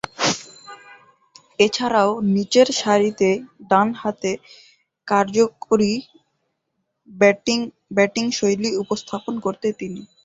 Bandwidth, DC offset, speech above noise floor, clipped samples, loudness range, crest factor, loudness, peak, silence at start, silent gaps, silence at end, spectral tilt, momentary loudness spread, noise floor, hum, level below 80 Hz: 8 kHz; under 0.1%; 55 dB; under 0.1%; 3 LU; 20 dB; -20 LUFS; -2 dBFS; 0.2 s; none; 0.2 s; -4 dB/octave; 12 LU; -75 dBFS; none; -62 dBFS